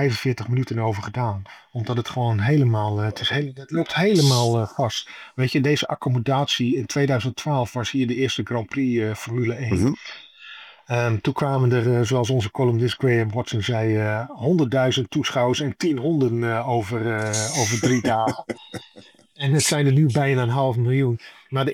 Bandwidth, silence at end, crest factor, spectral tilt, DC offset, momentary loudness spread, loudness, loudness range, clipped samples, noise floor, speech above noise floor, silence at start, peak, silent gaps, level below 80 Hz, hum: 15 kHz; 0 s; 16 dB; -5.5 dB/octave; under 0.1%; 8 LU; -22 LUFS; 3 LU; under 0.1%; -43 dBFS; 21 dB; 0 s; -6 dBFS; none; -60 dBFS; none